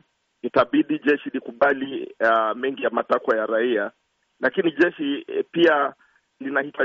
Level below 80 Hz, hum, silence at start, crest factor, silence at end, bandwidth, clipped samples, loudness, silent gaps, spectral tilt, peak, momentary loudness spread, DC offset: -68 dBFS; none; 0.45 s; 16 dB; 0 s; 6.8 kHz; under 0.1%; -22 LUFS; none; -2.5 dB/octave; -6 dBFS; 8 LU; under 0.1%